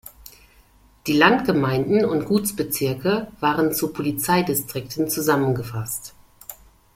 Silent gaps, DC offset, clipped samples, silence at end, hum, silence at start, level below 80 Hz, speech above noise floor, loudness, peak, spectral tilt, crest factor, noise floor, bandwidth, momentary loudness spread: none; under 0.1%; under 0.1%; 0.4 s; none; 0.05 s; -52 dBFS; 33 dB; -21 LUFS; -2 dBFS; -5 dB/octave; 20 dB; -54 dBFS; 16.5 kHz; 17 LU